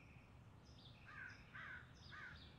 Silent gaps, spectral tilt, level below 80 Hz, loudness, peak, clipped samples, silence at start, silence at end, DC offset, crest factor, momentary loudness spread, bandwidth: none; -4.5 dB/octave; -72 dBFS; -58 LUFS; -44 dBFS; under 0.1%; 0 s; 0 s; under 0.1%; 14 dB; 9 LU; 9.6 kHz